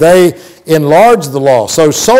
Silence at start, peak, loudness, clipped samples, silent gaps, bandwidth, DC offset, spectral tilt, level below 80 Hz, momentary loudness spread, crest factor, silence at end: 0 s; 0 dBFS; -8 LUFS; under 0.1%; none; 16.5 kHz; under 0.1%; -4.5 dB/octave; -44 dBFS; 6 LU; 8 dB; 0 s